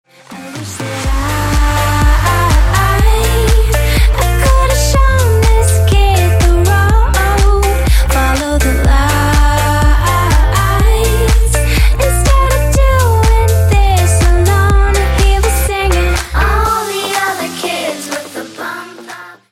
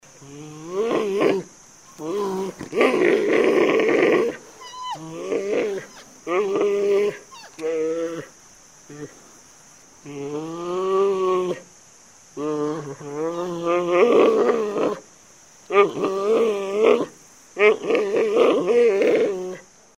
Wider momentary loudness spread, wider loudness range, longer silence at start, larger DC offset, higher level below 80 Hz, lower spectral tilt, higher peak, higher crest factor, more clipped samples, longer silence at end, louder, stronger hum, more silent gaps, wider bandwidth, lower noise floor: second, 9 LU vs 20 LU; second, 3 LU vs 7 LU; about the same, 0.3 s vs 0.2 s; neither; first, -12 dBFS vs -66 dBFS; about the same, -5 dB/octave vs -5 dB/octave; first, 0 dBFS vs -4 dBFS; second, 10 dB vs 18 dB; neither; second, 0.2 s vs 0.35 s; first, -12 LUFS vs -21 LUFS; neither; neither; first, 16 kHz vs 12.5 kHz; second, -31 dBFS vs -50 dBFS